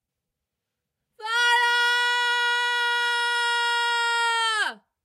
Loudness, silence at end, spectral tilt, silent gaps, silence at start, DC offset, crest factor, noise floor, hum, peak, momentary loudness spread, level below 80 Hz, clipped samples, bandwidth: -22 LUFS; 0.3 s; 3.5 dB/octave; none; 1.2 s; under 0.1%; 14 dB; -84 dBFS; none; -10 dBFS; 5 LU; under -90 dBFS; under 0.1%; 16 kHz